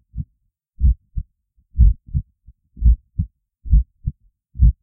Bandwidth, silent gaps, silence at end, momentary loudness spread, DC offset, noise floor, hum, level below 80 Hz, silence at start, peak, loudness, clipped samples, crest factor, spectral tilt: 0.4 kHz; none; 0.1 s; 17 LU; under 0.1%; -68 dBFS; none; -20 dBFS; 0.15 s; -2 dBFS; -21 LUFS; under 0.1%; 18 dB; -16.5 dB/octave